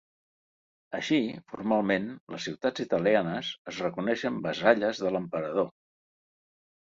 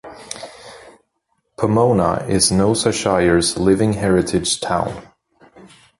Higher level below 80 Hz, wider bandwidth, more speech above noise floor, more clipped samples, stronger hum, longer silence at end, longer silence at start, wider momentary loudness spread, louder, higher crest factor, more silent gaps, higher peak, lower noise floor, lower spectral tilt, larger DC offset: second, -68 dBFS vs -40 dBFS; second, 7.8 kHz vs 11.5 kHz; first, over 62 dB vs 53 dB; neither; neither; first, 1.15 s vs 0.35 s; first, 0.9 s vs 0.05 s; second, 11 LU vs 17 LU; second, -29 LUFS vs -17 LUFS; first, 24 dB vs 16 dB; first, 2.20-2.27 s, 3.59-3.65 s vs none; second, -6 dBFS vs -2 dBFS; first, under -90 dBFS vs -69 dBFS; about the same, -5.5 dB/octave vs -4.5 dB/octave; neither